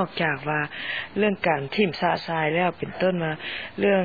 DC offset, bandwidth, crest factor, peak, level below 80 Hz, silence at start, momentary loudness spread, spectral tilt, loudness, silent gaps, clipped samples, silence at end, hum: 0.2%; 4.9 kHz; 18 dB; -8 dBFS; -60 dBFS; 0 s; 6 LU; -8 dB/octave; -25 LUFS; none; under 0.1%; 0 s; none